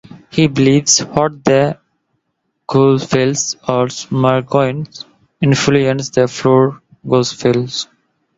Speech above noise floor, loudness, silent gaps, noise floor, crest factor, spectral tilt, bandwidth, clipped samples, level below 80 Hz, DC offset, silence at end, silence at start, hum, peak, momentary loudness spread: 56 dB; -14 LUFS; none; -70 dBFS; 14 dB; -5 dB/octave; 8 kHz; under 0.1%; -50 dBFS; under 0.1%; 0.55 s; 0.1 s; none; 0 dBFS; 13 LU